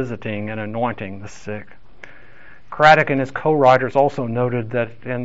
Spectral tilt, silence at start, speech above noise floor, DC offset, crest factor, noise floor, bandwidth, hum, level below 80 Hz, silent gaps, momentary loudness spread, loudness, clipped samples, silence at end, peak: -4.5 dB/octave; 0 s; 28 dB; 2%; 18 dB; -47 dBFS; 8 kHz; none; -54 dBFS; none; 19 LU; -18 LUFS; under 0.1%; 0 s; -2 dBFS